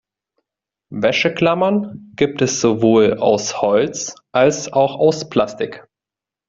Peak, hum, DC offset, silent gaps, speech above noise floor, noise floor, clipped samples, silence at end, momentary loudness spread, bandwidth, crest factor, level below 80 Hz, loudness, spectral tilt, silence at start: -2 dBFS; none; under 0.1%; none; 71 dB; -88 dBFS; under 0.1%; 0.7 s; 9 LU; 7.8 kHz; 16 dB; -56 dBFS; -17 LUFS; -4.5 dB/octave; 0.9 s